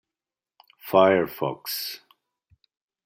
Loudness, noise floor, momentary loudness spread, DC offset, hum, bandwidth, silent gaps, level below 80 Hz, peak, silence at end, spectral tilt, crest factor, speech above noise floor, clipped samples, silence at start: -23 LUFS; under -90 dBFS; 20 LU; under 0.1%; none; 16.5 kHz; none; -70 dBFS; -4 dBFS; 1.1 s; -4.5 dB/octave; 22 dB; over 68 dB; under 0.1%; 0.85 s